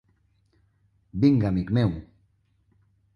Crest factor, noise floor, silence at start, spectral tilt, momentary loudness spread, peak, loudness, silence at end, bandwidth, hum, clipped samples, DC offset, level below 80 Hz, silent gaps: 20 dB; -66 dBFS; 1.15 s; -9.5 dB/octave; 16 LU; -8 dBFS; -23 LUFS; 1.1 s; 6.6 kHz; none; under 0.1%; under 0.1%; -48 dBFS; none